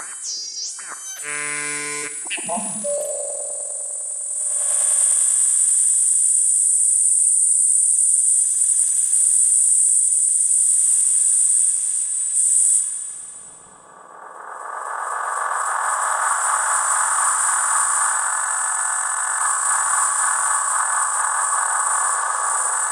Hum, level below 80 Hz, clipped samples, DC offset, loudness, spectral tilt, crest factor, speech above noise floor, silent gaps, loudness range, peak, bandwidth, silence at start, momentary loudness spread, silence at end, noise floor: none; -76 dBFS; under 0.1%; under 0.1%; -16 LUFS; 2 dB/octave; 16 dB; 19 dB; none; 10 LU; -4 dBFS; 16.5 kHz; 0 s; 12 LU; 0 s; -44 dBFS